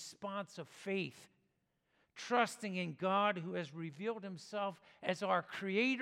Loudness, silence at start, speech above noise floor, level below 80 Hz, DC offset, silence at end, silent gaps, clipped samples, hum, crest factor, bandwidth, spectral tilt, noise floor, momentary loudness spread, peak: -39 LUFS; 0 s; 43 dB; -90 dBFS; under 0.1%; 0 s; none; under 0.1%; none; 22 dB; 15.5 kHz; -5 dB/octave; -81 dBFS; 12 LU; -18 dBFS